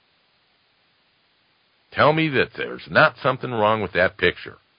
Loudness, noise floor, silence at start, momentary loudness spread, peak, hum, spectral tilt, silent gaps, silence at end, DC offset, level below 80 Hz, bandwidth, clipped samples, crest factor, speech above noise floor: -20 LUFS; -64 dBFS; 1.9 s; 10 LU; -2 dBFS; none; -10 dB/octave; none; 0.25 s; under 0.1%; -52 dBFS; 5.4 kHz; under 0.1%; 22 dB; 43 dB